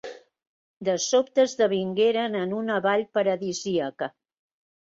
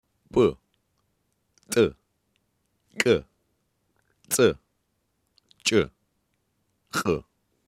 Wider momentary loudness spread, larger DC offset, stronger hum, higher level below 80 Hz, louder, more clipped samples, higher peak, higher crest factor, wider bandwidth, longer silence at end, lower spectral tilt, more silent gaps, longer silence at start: about the same, 10 LU vs 9 LU; neither; neither; second, -72 dBFS vs -56 dBFS; about the same, -25 LUFS vs -25 LUFS; neither; second, -10 dBFS vs -2 dBFS; second, 16 dB vs 26 dB; second, 7.8 kHz vs 15 kHz; first, 0.85 s vs 0.5 s; about the same, -4 dB/octave vs -4 dB/octave; first, 0.47-0.81 s vs none; second, 0.05 s vs 0.35 s